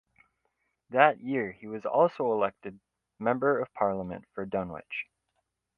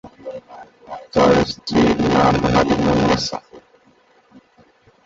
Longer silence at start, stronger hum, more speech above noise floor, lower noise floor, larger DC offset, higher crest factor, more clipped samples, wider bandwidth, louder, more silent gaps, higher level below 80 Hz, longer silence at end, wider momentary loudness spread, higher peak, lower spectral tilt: first, 0.9 s vs 0.05 s; neither; first, 51 dB vs 38 dB; first, -80 dBFS vs -55 dBFS; neither; first, 26 dB vs 18 dB; neither; second, 5.2 kHz vs 7.8 kHz; second, -29 LUFS vs -17 LUFS; neither; second, -66 dBFS vs -38 dBFS; second, 0.75 s vs 1.45 s; second, 15 LU vs 19 LU; about the same, -4 dBFS vs -2 dBFS; first, -8.5 dB/octave vs -6 dB/octave